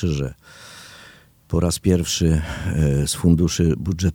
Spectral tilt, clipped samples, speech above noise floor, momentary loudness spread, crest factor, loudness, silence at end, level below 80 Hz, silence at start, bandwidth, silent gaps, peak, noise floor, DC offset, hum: -5.5 dB/octave; under 0.1%; 28 dB; 22 LU; 18 dB; -20 LUFS; 0 s; -32 dBFS; 0 s; 17.5 kHz; none; -4 dBFS; -48 dBFS; under 0.1%; none